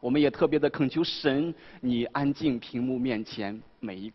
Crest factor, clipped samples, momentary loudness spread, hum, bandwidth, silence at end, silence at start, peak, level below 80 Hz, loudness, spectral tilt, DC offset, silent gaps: 18 dB; under 0.1%; 11 LU; none; 6 kHz; 0 s; 0.05 s; -10 dBFS; -58 dBFS; -28 LUFS; -7.5 dB/octave; under 0.1%; none